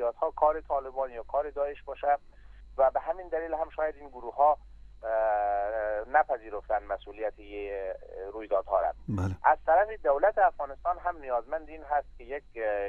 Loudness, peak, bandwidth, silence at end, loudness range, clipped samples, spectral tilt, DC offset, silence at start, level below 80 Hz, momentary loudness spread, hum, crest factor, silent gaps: -30 LUFS; -10 dBFS; 7 kHz; 0 s; 4 LU; under 0.1%; -8 dB/octave; under 0.1%; 0 s; -50 dBFS; 12 LU; 50 Hz at -55 dBFS; 20 dB; none